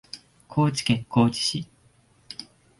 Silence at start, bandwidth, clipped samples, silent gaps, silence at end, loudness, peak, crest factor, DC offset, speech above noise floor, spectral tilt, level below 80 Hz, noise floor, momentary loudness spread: 0.15 s; 11.5 kHz; under 0.1%; none; 0.35 s; -24 LUFS; -8 dBFS; 20 dB; under 0.1%; 37 dB; -5 dB/octave; -56 dBFS; -60 dBFS; 21 LU